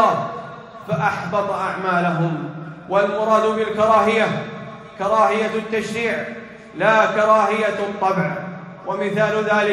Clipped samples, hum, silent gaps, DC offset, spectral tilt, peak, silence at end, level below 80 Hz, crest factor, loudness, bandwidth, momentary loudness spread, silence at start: under 0.1%; none; none; under 0.1%; -6 dB/octave; -2 dBFS; 0 s; -60 dBFS; 16 dB; -19 LUFS; 12 kHz; 17 LU; 0 s